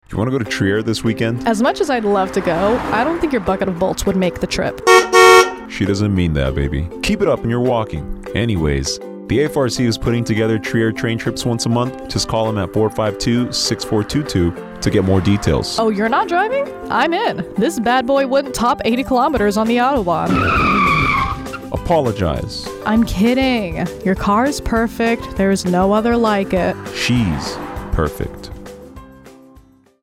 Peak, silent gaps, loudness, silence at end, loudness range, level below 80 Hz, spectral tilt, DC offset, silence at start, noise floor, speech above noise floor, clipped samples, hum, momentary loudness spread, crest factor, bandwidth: 0 dBFS; none; -17 LUFS; 0.7 s; 5 LU; -34 dBFS; -5 dB/octave; under 0.1%; 0.1 s; -48 dBFS; 31 dB; under 0.1%; none; 7 LU; 16 dB; 16 kHz